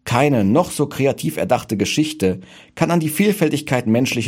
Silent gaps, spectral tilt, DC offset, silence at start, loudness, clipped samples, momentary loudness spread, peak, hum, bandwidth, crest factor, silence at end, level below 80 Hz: none; -5.5 dB/octave; under 0.1%; 0.05 s; -18 LUFS; under 0.1%; 6 LU; -2 dBFS; none; 17 kHz; 16 dB; 0 s; -52 dBFS